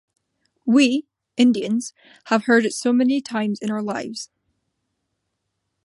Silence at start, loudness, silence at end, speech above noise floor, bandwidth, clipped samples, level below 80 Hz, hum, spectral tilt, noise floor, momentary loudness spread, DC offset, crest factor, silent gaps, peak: 0.65 s; -20 LUFS; 1.6 s; 57 dB; 11.5 kHz; under 0.1%; -72 dBFS; none; -4.5 dB/octave; -77 dBFS; 15 LU; under 0.1%; 18 dB; none; -4 dBFS